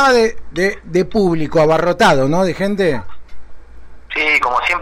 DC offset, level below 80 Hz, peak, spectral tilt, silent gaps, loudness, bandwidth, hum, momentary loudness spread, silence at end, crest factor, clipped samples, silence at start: under 0.1%; -38 dBFS; -4 dBFS; -5.5 dB/octave; none; -15 LUFS; 16 kHz; none; 6 LU; 0 s; 12 dB; under 0.1%; 0 s